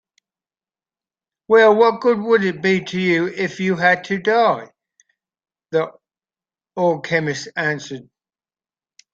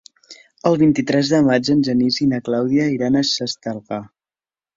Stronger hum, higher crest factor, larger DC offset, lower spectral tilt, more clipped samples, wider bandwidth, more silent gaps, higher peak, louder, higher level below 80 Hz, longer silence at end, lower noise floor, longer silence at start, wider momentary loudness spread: neither; about the same, 18 dB vs 18 dB; neither; about the same, -5.5 dB/octave vs -5.5 dB/octave; neither; about the same, 7.6 kHz vs 7.8 kHz; neither; about the same, -2 dBFS vs 0 dBFS; about the same, -18 LUFS vs -18 LUFS; second, -66 dBFS vs -56 dBFS; first, 1.1 s vs 0.7 s; about the same, under -90 dBFS vs under -90 dBFS; first, 1.5 s vs 0.3 s; about the same, 13 LU vs 11 LU